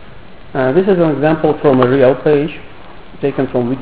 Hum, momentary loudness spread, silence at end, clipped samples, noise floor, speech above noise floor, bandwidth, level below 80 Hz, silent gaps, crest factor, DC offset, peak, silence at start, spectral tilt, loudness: none; 10 LU; 0 s; under 0.1%; -37 dBFS; 24 dB; 4 kHz; -44 dBFS; none; 14 dB; 2%; 0 dBFS; 0.05 s; -11.5 dB/octave; -13 LUFS